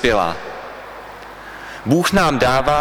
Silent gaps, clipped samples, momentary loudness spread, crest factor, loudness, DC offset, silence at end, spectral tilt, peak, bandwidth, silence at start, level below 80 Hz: none; under 0.1%; 19 LU; 18 dB; -17 LUFS; under 0.1%; 0 s; -5 dB/octave; 0 dBFS; over 20 kHz; 0 s; -38 dBFS